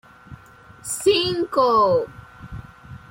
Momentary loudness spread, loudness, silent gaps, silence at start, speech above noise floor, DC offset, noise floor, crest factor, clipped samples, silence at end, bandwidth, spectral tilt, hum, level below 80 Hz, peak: 22 LU; -19 LUFS; none; 0.3 s; 28 dB; under 0.1%; -47 dBFS; 16 dB; under 0.1%; 0.15 s; 16.5 kHz; -3.5 dB/octave; none; -50 dBFS; -6 dBFS